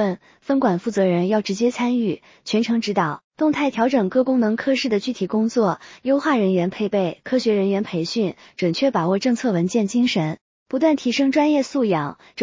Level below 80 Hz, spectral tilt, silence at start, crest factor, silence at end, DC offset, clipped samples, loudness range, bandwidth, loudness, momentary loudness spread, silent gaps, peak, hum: -64 dBFS; -6 dB/octave; 0 s; 14 dB; 0 s; under 0.1%; under 0.1%; 1 LU; 7.6 kHz; -21 LUFS; 6 LU; 3.24-3.31 s, 10.41-10.66 s; -6 dBFS; none